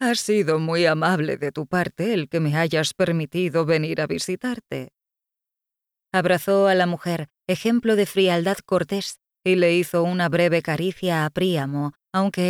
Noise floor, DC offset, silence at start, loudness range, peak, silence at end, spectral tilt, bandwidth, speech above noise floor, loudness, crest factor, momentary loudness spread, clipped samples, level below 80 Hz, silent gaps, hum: -87 dBFS; under 0.1%; 0 s; 4 LU; -8 dBFS; 0 s; -5.5 dB/octave; 17 kHz; 66 dB; -22 LUFS; 14 dB; 9 LU; under 0.1%; -62 dBFS; none; none